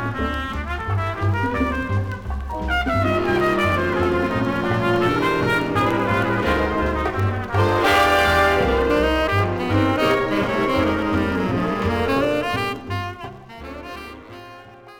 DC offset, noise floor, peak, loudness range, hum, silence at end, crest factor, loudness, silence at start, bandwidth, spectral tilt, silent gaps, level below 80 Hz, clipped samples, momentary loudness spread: under 0.1%; -42 dBFS; -4 dBFS; 5 LU; none; 0 s; 16 dB; -20 LUFS; 0 s; 18.5 kHz; -6.5 dB/octave; none; -34 dBFS; under 0.1%; 14 LU